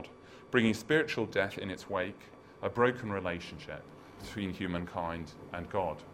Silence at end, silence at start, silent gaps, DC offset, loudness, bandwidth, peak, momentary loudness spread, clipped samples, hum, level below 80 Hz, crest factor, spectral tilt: 0 s; 0 s; none; under 0.1%; -34 LUFS; 16 kHz; -12 dBFS; 18 LU; under 0.1%; none; -62 dBFS; 22 dB; -5.5 dB/octave